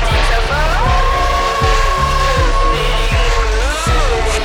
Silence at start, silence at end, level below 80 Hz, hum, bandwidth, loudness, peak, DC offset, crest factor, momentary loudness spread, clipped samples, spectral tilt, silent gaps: 0 s; 0 s; -16 dBFS; none; 14.5 kHz; -14 LUFS; 0 dBFS; under 0.1%; 12 dB; 2 LU; under 0.1%; -4 dB/octave; none